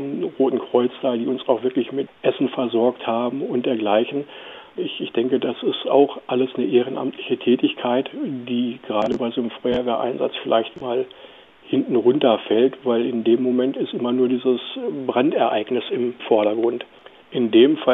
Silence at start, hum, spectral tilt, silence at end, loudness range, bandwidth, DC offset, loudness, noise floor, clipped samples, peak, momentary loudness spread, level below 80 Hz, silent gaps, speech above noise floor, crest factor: 0 s; none; -8 dB/octave; 0 s; 3 LU; 4 kHz; under 0.1%; -21 LUFS; -45 dBFS; under 0.1%; -2 dBFS; 8 LU; -64 dBFS; none; 25 dB; 18 dB